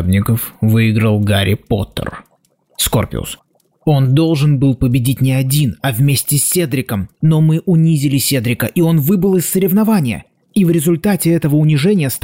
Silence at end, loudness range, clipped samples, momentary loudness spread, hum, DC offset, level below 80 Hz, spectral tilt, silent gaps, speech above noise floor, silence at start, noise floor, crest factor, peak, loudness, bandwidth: 0.05 s; 3 LU; under 0.1%; 8 LU; none; 0.2%; -40 dBFS; -5.5 dB/octave; none; 44 dB; 0 s; -57 dBFS; 10 dB; -4 dBFS; -14 LUFS; 16.5 kHz